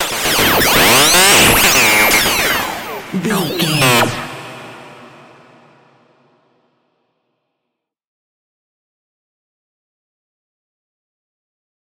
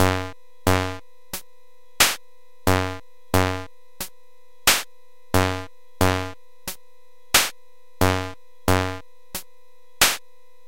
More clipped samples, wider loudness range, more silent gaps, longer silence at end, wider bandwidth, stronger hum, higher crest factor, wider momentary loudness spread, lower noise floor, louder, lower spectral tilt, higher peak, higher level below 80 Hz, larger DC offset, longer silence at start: neither; first, 10 LU vs 2 LU; neither; first, 6.95 s vs 0.5 s; about the same, 17 kHz vs 17 kHz; neither; second, 16 dB vs 24 dB; about the same, 18 LU vs 17 LU; first, -77 dBFS vs -59 dBFS; first, -10 LUFS vs -22 LUFS; about the same, -2 dB/octave vs -3 dB/octave; about the same, 0 dBFS vs -2 dBFS; about the same, -40 dBFS vs -44 dBFS; second, under 0.1% vs 1%; about the same, 0 s vs 0 s